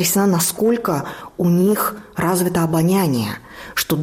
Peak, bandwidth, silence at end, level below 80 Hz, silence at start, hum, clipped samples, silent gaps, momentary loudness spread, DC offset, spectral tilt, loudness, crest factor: -6 dBFS; 16 kHz; 0 s; -50 dBFS; 0 s; none; under 0.1%; none; 9 LU; under 0.1%; -5 dB/octave; -18 LUFS; 12 dB